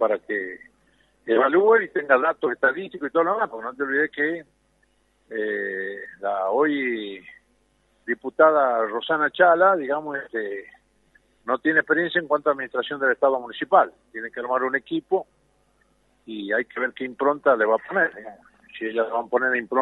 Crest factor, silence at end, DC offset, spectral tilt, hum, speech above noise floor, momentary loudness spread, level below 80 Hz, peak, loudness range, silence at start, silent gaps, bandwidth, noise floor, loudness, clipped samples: 20 dB; 0 s; under 0.1%; -7 dB/octave; none; 42 dB; 15 LU; -70 dBFS; -4 dBFS; 6 LU; 0 s; none; 4.1 kHz; -65 dBFS; -22 LUFS; under 0.1%